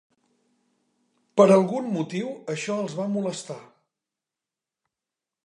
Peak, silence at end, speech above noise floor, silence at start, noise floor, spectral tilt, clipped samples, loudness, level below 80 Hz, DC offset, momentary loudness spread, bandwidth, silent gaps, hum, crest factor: -2 dBFS; 1.8 s; 66 dB; 1.35 s; -89 dBFS; -6 dB/octave; under 0.1%; -24 LUFS; -78 dBFS; under 0.1%; 16 LU; 11 kHz; none; none; 24 dB